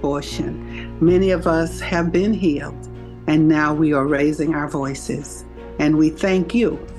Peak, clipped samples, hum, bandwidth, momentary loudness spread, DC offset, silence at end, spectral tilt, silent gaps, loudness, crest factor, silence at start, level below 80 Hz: -6 dBFS; under 0.1%; none; 12.5 kHz; 15 LU; under 0.1%; 0 s; -6.5 dB/octave; none; -19 LUFS; 14 dB; 0 s; -36 dBFS